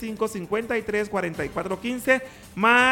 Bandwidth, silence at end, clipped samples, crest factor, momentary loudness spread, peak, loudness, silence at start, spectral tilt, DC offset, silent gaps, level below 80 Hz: 18 kHz; 0 s; under 0.1%; 20 dB; 9 LU; -4 dBFS; -24 LUFS; 0 s; -4 dB/octave; under 0.1%; none; -54 dBFS